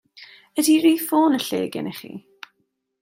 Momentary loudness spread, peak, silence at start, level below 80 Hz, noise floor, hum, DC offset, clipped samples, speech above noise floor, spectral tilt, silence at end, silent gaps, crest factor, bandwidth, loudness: 20 LU; -6 dBFS; 0.15 s; -72 dBFS; -72 dBFS; none; under 0.1%; under 0.1%; 52 dB; -3.5 dB/octave; 0.85 s; none; 16 dB; 16 kHz; -20 LUFS